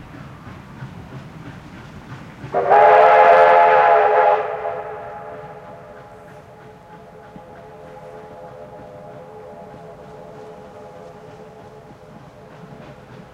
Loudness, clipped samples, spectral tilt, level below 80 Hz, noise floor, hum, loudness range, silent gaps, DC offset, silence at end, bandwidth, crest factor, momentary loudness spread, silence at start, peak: -13 LUFS; under 0.1%; -6 dB/octave; -56 dBFS; -42 dBFS; none; 25 LU; none; under 0.1%; 2.45 s; 8.2 kHz; 20 dB; 29 LU; 0.15 s; 0 dBFS